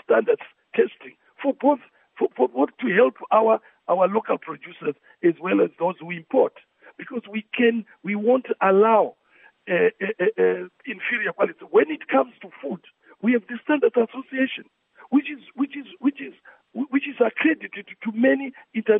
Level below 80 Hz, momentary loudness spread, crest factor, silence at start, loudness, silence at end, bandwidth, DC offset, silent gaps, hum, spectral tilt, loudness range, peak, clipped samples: -84 dBFS; 13 LU; 18 dB; 0.1 s; -23 LUFS; 0 s; 3.8 kHz; under 0.1%; none; none; -10 dB/octave; 4 LU; -4 dBFS; under 0.1%